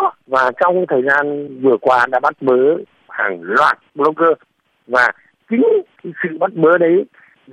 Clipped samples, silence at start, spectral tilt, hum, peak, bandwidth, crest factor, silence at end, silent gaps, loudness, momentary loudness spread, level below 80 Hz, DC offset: under 0.1%; 0 s; -6.5 dB/octave; none; -2 dBFS; 10.5 kHz; 14 dB; 0.45 s; none; -15 LUFS; 9 LU; -64 dBFS; under 0.1%